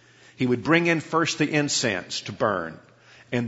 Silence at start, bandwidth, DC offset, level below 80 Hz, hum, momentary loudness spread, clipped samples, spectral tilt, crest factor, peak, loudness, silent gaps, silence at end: 0.4 s; 8 kHz; under 0.1%; -64 dBFS; none; 10 LU; under 0.1%; -4 dB/octave; 20 dB; -4 dBFS; -24 LUFS; none; 0 s